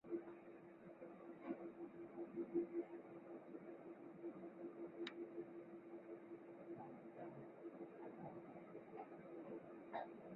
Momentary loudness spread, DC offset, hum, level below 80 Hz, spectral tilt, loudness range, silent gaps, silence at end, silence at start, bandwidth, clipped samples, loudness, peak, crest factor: 8 LU; under 0.1%; none; under -90 dBFS; -4 dB/octave; 5 LU; none; 0 s; 0.05 s; 3.9 kHz; under 0.1%; -54 LUFS; -32 dBFS; 22 dB